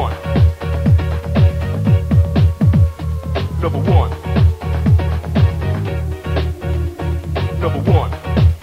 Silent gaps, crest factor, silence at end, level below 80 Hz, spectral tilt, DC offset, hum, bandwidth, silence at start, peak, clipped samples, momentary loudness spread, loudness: none; 14 dB; 0 s; -22 dBFS; -8.5 dB/octave; under 0.1%; none; 7.4 kHz; 0 s; 0 dBFS; under 0.1%; 7 LU; -17 LUFS